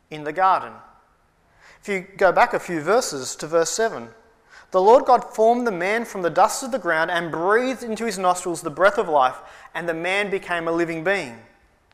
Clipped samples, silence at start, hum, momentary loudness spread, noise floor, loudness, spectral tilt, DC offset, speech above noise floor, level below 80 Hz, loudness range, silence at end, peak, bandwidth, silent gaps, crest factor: under 0.1%; 0.1 s; none; 11 LU; -60 dBFS; -21 LUFS; -3.5 dB/octave; under 0.1%; 39 dB; -58 dBFS; 3 LU; 0.55 s; -4 dBFS; 15.5 kHz; none; 18 dB